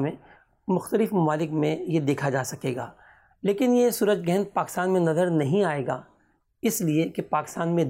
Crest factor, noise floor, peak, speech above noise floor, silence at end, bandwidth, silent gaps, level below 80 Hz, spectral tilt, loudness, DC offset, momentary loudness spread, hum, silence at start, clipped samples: 14 dB; -66 dBFS; -12 dBFS; 41 dB; 0 s; 16 kHz; none; -66 dBFS; -6 dB/octave; -25 LUFS; under 0.1%; 9 LU; none; 0 s; under 0.1%